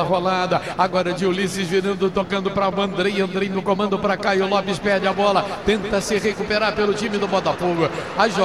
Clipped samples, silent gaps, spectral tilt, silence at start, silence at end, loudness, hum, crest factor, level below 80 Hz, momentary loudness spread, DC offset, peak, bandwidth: under 0.1%; none; -5 dB/octave; 0 s; 0 s; -20 LUFS; none; 18 dB; -48 dBFS; 3 LU; 0.3%; -4 dBFS; 14 kHz